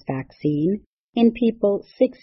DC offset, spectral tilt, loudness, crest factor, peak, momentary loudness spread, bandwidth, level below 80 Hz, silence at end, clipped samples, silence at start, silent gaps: under 0.1%; -11.5 dB/octave; -22 LUFS; 16 dB; -6 dBFS; 11 LU; 5.8 kHz; -56 dBFS; 0.1 s; under 0.1%; 0.1 s; 0.86-1.13 s